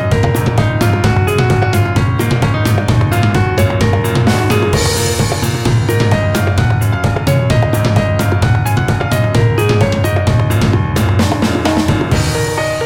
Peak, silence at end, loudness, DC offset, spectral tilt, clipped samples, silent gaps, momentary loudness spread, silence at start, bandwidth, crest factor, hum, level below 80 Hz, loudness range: 0 dBFS; 0 s; -13 LUFS; under 0.1%; -6 dB/octave; under 0.1%; none; 2 LU; 0 s; 17.5 kHz; 12 dB; none; -28 dBFS; 0 LU